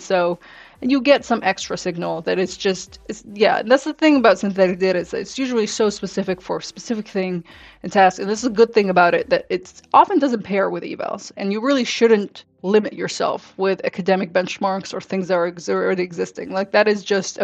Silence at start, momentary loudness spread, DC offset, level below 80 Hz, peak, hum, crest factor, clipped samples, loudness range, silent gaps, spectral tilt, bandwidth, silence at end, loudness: 0 s; 12 LU; under 0.1%; -58 dBFS; -2 dBFS; none; 18 dB; under 0.1%; 4 LU; none; -4.5 dB/octave; 8.8 kHz; 0 s; -19 LUFS